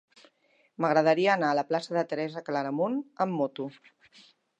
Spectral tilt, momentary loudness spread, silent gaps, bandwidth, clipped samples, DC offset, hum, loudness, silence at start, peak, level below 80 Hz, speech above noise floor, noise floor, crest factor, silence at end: -6 dB/octave; 9 LU; none; 9 kHz; under 0.1%; under 0.1%; none; -28 LUFS; 0.8 s; -10 dBFS; -84 dBFS; 40 dB; -68 dBFS; 20 dB; 0.9 s